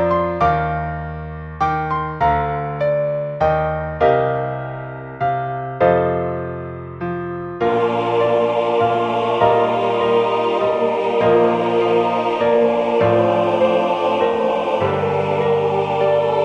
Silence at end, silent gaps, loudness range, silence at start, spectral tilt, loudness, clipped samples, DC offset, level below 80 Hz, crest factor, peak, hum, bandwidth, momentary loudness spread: 0 s; none; 4 LU; 0 s; -7.5 dB/octave; -18 LUFS; under 0.1%; under 0.1%; -42 dBFS; 16 dB; -2 dBFS; none; 8.2 kHz; 10 LU